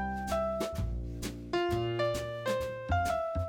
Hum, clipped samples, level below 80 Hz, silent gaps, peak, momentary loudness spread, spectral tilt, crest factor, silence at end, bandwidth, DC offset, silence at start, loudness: none; under 0.1%; -44 dBFS; none; -18 dBFS; 7 LU; -6 dB/octave; 14 dB; 0 s; 19 kHz; under 0.1%; 0 s; -33 LUFS